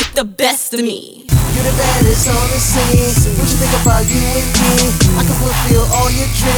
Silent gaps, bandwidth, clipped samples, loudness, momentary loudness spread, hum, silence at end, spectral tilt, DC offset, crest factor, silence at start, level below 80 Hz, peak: none; over 20 kHz; under 0.1%; -13 LUFS; 4 LU; none; 0 s; -4 dB/octave; under 0.1%; 12 dB; 0 s; -18 dBFS; 0 dBFS